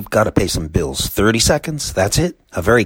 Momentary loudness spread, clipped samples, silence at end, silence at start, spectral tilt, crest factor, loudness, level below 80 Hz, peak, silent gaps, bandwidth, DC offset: 7 LU; under 0.1%; 0 s; 0 s; -4 dB/octave; 16 dB; -17 LUFS; -30 dBFS; 0 dBFS; none; 17 kHz; under 0.1%